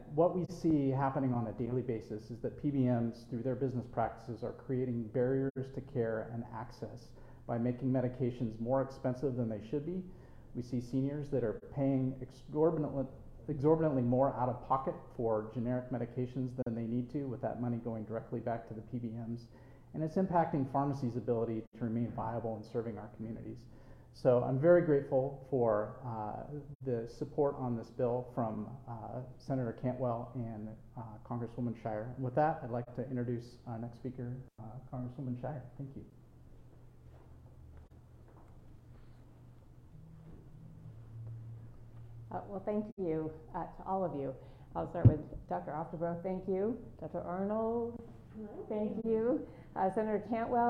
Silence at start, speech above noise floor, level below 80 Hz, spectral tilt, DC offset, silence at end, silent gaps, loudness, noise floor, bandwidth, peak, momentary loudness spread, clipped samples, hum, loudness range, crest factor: 0 s; 22 dB; -58 dBFS; -10 dB/octave; under 0.1%; 0 s; 5.50-5.55 s, 21.67-21.72 s, 26.75-26.80 s, 42.92-42.97 s; -36 LUFS; -57 dBFS; 9.6 kHz; -12 dBFS; 16 LU; under 0.1%; none; 12 LU; 24 dB